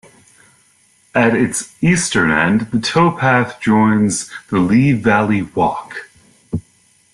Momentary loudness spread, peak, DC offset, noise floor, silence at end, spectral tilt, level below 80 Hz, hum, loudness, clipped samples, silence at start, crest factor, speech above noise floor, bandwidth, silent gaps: 14 LU; -2 dBFS; under 0.1%; -54 dBFS; 0.55 s; -5 dB/octave; -48 dBFS; none; -15 LUFS; under 0.1%; 1.15 s; 14 dB; 40 dB; 12.5 kHz; none